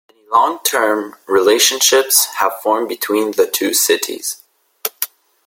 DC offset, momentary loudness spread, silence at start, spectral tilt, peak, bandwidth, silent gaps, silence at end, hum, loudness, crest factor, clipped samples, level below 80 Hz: under 0.1%; 14 LU; 0.3 s; 0 dB/octave; 0 dBFS; 17 kHz; none; 0.4 s; none; -15 LUFS; 16 dB; under 0.1%; -64 dBFS